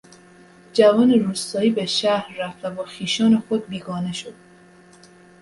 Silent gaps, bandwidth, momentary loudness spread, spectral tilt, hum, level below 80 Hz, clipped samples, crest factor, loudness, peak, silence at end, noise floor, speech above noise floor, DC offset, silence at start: none; 11.5 kHz; 14 LU; -5 dB/octave; none; -64 dBFS; under 0.1%; 20 dB; -20 LUFS; -2 dBFS; 1.1 s; -49 dBFS; 29 dB; under 0.1%; 0.75 s